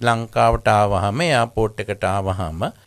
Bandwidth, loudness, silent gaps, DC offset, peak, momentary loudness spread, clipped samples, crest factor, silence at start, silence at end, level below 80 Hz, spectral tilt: 13.5 kHz; -19 LUFS; none; under 0.1%; -2 dBFS; 8 LU; under 0.1%; 18 dB; 0 s; 0.15 s; -36 dBFS; -5.5 dB/octave